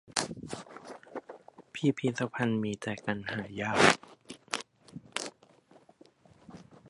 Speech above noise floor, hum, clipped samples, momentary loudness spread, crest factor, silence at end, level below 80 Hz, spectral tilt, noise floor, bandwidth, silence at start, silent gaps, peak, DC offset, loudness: 31 dB; none; under 0.1%; 26 LU; 30 dB; 0 s; -68 dBFS; -4 dB/octave; -61 dBFS; 11.5 kHz; 0.1 s; none; -4 dBFS; under 0.1%; -31 LUFS